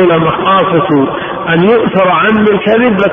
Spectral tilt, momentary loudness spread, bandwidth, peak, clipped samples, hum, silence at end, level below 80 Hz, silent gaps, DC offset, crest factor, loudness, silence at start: -9 dB/octave; 4 LU; 4.2 kHz; 0 dBFS; under 0.1%; none; 0 s; -42 dBFS; none; under 0.1%; 8 dB; -9 LUFS; 0 s